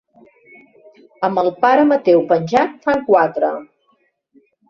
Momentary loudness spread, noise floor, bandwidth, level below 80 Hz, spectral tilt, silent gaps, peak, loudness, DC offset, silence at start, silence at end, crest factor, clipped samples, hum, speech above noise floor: 8 LU; -62 dBFS; 7.2 kHz; -60 dBFS; -7 dB/octave; none; -2 dBFS; -16 LUFS; under 0.1%; 1.2 s; 1.05 s; 16 dB; under 0.1%; none; 47 dB